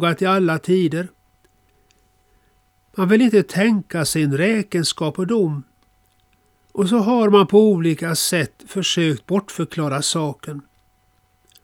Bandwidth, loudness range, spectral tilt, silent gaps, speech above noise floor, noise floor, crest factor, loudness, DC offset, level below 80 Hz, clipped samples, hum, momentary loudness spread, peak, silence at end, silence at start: 18 kHz; 4 LU; -5 dB/octave; none; 43 dB; -61 dBFS; 18 dB; -18 LUFS; under 0.1%; -60 dBFS; under 0.1%; none; 13 LU; -2 dBFS; 1.05 s; 0 s